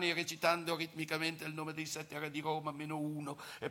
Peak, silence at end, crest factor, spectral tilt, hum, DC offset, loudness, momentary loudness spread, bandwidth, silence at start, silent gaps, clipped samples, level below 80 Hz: -18 dBFS; 0 s; 22 dB; -4 dB/octave; none; under 0.1%; -38 LUFS; 9 LU; 17 kHz; 0 s; none; under 0.1%; -82 dBFS